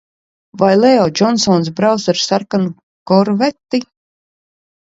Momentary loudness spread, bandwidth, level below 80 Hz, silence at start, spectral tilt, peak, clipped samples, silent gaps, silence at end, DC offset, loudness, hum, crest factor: 9 LU; 7.8 kHz; -56 dBFS; 0.55 s; -5 dB/octave; 0 dBFS; under 0.1%; 2.83-3.06 s; 1 s; under 0.1%; -14 LUFS; none; 14 dB